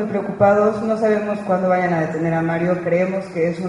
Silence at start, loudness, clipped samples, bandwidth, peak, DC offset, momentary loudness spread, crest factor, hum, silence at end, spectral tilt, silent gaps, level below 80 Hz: 0 s; -19 LUFS; under 0.1%; 11 kHz; -2 dBFS; under 0.1%; 6 LU; 18 dB; none; 0 s; -8 dB/octave; none; -54 dBFS